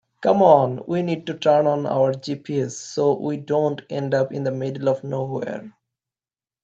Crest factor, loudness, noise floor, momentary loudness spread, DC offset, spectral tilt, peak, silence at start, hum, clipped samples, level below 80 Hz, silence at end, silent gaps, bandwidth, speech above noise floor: 20 dB; -21 LUFS; under -90 dBFS; 11 LU; under 0.1%; -6.5 dB/octave; -2 dBFS; 0.2 s; none; under 0.1%; -68 dBFS; 0.95 s; none; 8 kHz; over 69 dB